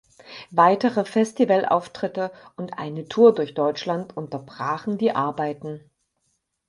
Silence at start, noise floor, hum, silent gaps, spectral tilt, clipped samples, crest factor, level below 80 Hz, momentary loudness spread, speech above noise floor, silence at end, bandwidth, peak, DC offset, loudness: 0.3 s; -73 dBFS; none; none; -6.5 dB/octave; under 0.1%; 20 dB; -68 dBFS; 17 LU; 50 dB; 0.9 s; 11.5 kHz; -2 dBFS; under 0.1%; -22 LUFS